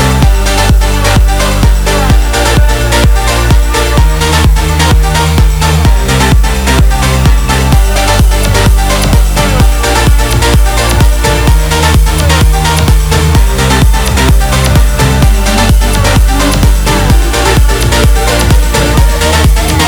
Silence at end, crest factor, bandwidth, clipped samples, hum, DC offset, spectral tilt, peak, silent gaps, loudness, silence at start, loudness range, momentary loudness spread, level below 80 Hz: 0 s; 6 dB; over 20 kHz; 1%; none; under 0.1%; -4.5 dB/octave; 0 dBFS; none; -8 LUFS; 0 s; 0 LU; 1 LU; -8 dBFS